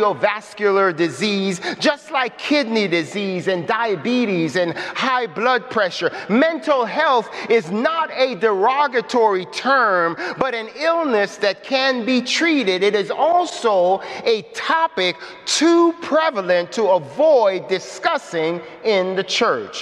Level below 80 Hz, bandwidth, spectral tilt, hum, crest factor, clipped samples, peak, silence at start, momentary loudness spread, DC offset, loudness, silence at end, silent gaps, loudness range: -68 dBFS; 12 kHz; -4 dB/octave; none; 16 dB; under 0.1%; -4 dBFS; 0 s; 6 LU; under 0.1%; -18 LUFS; 0 s; none; 2 LU